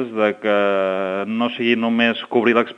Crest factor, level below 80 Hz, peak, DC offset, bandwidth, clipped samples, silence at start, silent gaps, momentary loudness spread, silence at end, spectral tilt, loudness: 18 dB; -74 dBFS; 0 dBFS; under 0.1%; 6.6 kHz; under 0.1%; 0 s; none; 5 LU; 0.05 s; -6.5 dB/octave; -19 LUFS